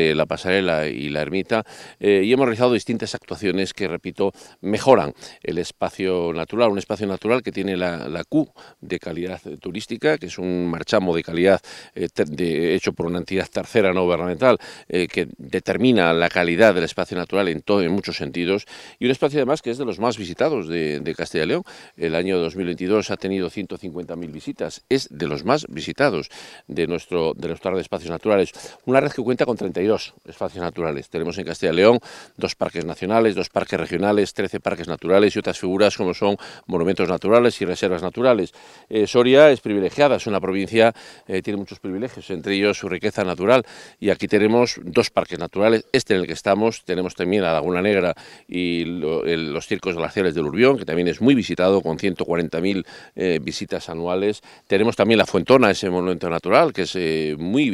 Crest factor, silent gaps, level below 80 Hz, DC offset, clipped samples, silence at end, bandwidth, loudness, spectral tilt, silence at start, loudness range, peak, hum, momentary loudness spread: 20 dB; none; -56 dBFS; under 0.1%; under 0.1%; 0 s; 13 kHz; -21 LUFS; -5.5 dB/octave; 0 s; 5 LU; 0 dBFS; none; 12 LU